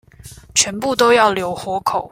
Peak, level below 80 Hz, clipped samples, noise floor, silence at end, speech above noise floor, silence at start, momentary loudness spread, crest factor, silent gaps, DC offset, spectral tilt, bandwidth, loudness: 0 dBFS; -50 dBFS; under 0.1%; -40 dBFS; 0.05 s; 24 dB; 0.25 s; 10 LU; 18 dB; none; under 0.1%; -2 dB/octave; 16.5 kHz; -16 LUFS